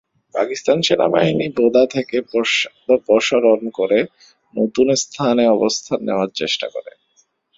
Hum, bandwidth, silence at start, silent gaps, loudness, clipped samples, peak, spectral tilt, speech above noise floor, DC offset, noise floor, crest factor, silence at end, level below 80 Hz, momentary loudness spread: none; 7.8 kHz; 0.35 s; none; -17 LUFS; under 0.1%; 0 dBFS; -4 dB/octave; 44 dB; under 0.1%; -61 dBFS; 18 dB; 0.7 s; -58 dBFS; 8 LU